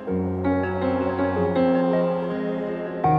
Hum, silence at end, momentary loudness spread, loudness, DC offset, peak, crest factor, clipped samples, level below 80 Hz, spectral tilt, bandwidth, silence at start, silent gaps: none; 0 s; 6 LU; -23 LUFS; under 0.1%; -10 dBFS; 14 dB; under 0.1%; -52 dBFS; -10 dB/octave; 5 kHz; 0 s; none